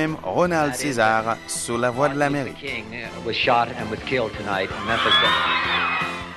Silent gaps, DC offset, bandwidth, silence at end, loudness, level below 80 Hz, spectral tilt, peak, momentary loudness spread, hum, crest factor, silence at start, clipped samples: none; under 0.1%; 12.5 kHz; 0 s; -21 LUFS; -48 dBFS; -3.5 dB/octave; -6 dBFS; 11 LU; none; 16 dB; 0 s; under 0.1%